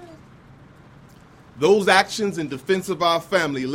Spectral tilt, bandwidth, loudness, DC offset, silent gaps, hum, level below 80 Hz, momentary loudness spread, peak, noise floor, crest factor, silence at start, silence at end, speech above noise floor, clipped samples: -4 dB/octave; 16.5 kHz; -20 LUFS; under 0.1%; none; none; -60 dBFS; 9 LU; 0 dBFS; -48 dBFS; 22 dB; 0 s; 0 s; 28 dB; under 0.1%